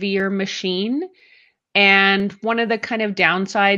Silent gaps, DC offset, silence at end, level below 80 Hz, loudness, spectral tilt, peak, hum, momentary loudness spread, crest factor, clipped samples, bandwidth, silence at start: none; under 0.1%; 0 s; -66 dBFS; -18 LUFS; -4.5 dB/octave; -2 dBFS; none; 10 LU; 18 dB; under 0.1%; 7.8 kHz; 0 s